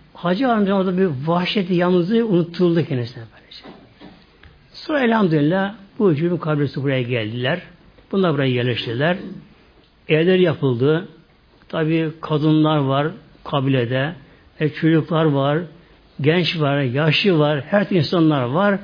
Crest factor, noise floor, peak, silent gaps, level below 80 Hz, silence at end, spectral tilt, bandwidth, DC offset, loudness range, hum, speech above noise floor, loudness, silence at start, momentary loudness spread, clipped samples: 18 dB; -52 dBFS; -2 dBFS; none; -56 dBFS; 0 s; -8.5 dB/octave; 5.2 kHz; under 0.1%; 3 LU; none; 34 dB; -19 LUFS; 0.15 s; 10 LU; under 0.1%